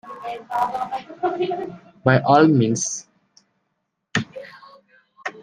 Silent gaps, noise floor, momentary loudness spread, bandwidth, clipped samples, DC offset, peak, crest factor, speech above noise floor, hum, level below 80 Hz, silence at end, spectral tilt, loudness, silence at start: none; -75 dBFS; 20 LU; 10.5 kHz; under 0.1%; under 0.1%; -2 dBFS; 22 dB; 56 dB; none; -64 dBFS; 0 s; -5.5 dB/octave; -21 LUFS; 0.05 s